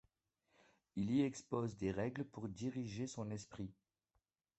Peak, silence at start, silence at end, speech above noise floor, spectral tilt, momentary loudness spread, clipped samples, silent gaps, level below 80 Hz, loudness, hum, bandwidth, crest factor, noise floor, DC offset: -24 dBFS; 0.95 s; 0.85 s; 44 dB; -6.5 dB/octave; 13 LU; under 0.1%; none; -68 dBFS; -43 LUFS; none; 8.2 kHz; 20 dB; -86 dBFS; under 0.1%